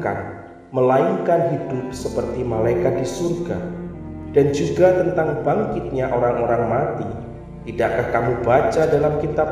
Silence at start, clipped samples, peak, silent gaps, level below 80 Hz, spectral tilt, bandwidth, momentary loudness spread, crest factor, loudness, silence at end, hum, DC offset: 0 s; under 0.1%; -2 dBFS; none; -40 dBFS; -7 dB/octave; 14.5 kHz; 13 LU; 18 dB; -20 LUFS; 0 s; none; under 0.1%